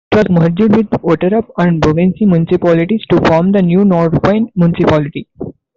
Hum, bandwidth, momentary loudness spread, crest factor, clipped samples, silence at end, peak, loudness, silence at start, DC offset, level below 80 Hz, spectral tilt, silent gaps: none; 7.2 kHz; 4 LU; 10 dB; under 0.1%; 0.25 s; -2 dBFS; -11 LUFS; 0.1 s; under 0.1%; -38 dBFS; -9 dB/octave; none